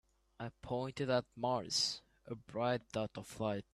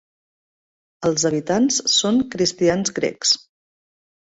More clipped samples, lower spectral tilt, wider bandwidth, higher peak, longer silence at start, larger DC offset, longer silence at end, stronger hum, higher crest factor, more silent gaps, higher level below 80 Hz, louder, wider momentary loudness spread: neither; about the same, -4 dB/octave vs -3 dB/octave; first, 13.5 kHz vs 8.2 kHz; second, -20 dBFS vs -6 dBFS; second, 0.4 s vs 1 s; neither; second, 0.1 s vs 0.85 s; neither; about the same, 18 dB vs 16 dB; neither; second, -68 dBFS vs -58 dBFS; second, -38 LUFS vs -19 LUFS; first, 14 LU vs 5 LU